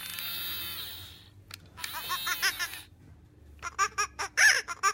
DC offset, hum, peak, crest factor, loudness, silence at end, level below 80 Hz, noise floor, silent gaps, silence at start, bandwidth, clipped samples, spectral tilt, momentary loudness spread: under 0.1%; 50 Hz at -65 dBFS; -10 dBFS; 22 dB; -29 LUFS; 0 s; -60 dBFS; -54 dBFS; none; 0 s; 16.5 kHz; under 0.1%; 1 dB/octave; 23 LU